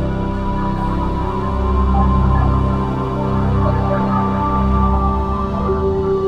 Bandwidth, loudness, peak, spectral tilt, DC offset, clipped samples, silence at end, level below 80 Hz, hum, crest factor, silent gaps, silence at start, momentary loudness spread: 6 kHz; -18 LUFS; -2 dBFS; -9.5 dB/octave; under 0.1%; under 0.1%; 0 s; -20 dBFS; none; 14 dB; none; 0 s; 5 LU